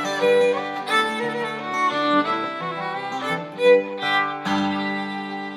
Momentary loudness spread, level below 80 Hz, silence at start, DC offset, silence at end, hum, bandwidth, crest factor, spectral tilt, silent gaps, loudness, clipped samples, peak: 10 LU; -82 dBFS; 0 s; under 0.1%; 0 s; none; 13.5 kHz; 16 dB; -4.5 dB/octave; none; -22 LUFS; under 0.1%; -6 dBFS